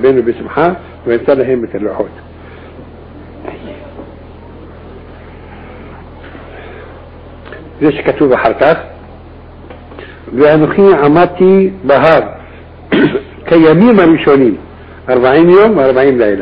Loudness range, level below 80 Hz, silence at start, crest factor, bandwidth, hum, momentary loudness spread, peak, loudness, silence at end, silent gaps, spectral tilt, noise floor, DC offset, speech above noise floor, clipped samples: 23 LU; -38 dBFS; 0 s; 12 dB; 5.2 kHz; none; 25 LU; 0 dBFS; -9 LUFS; 0 s; none; -9.5 dB/octave; -33 dBFS; under 0.1%; 24 dB; under 0.1%